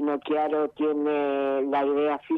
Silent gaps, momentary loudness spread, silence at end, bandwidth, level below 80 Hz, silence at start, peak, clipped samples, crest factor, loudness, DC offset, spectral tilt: none; 2 LU; 0 s; 4.3 kHz; -72 dBFS; 0 s; -14 dBFS; under 0.1%; 10 dB; -25 LUFS; under 0.1%; -7.5 dB/octave